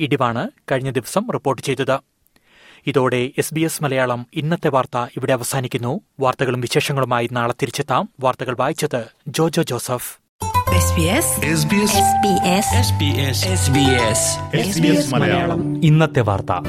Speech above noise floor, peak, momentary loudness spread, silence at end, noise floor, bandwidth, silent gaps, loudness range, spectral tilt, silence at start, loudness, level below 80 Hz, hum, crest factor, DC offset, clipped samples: 37 dB; -2 dBFS; 8 LU; 0 s; -55 dBFS; 16.5 kHz; 10.29-10.39 s; 5 LU; -4.5 dB/octave; 0 s; -18 LUFS; -44 dBFS; none; 16 dB; under 0.1%; under 0.1%